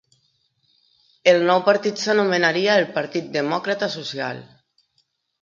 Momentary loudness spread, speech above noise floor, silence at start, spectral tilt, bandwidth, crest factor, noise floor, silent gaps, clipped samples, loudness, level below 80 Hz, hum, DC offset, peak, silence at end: 10 LU; 49 dB; 1.25 s; -4.5 dB/octave; 7.6 kHz; 20 dB; -69 dBFS; none; under 0.1%; -20 LUFS; -72 dBFS; none; under 0.1%; -2 dBFS; 1 s